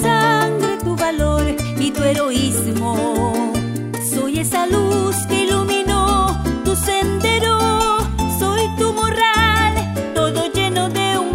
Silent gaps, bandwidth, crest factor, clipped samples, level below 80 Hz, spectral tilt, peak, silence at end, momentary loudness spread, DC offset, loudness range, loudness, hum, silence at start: none; 16.5 kHz; 16 dB; under 0.1%; -30 dBFS; -4.5 dB/octave; 0 dBFS; 0 s; 5 LU; under 0.1%; 2 LU; -17 LUFS; none; 0 s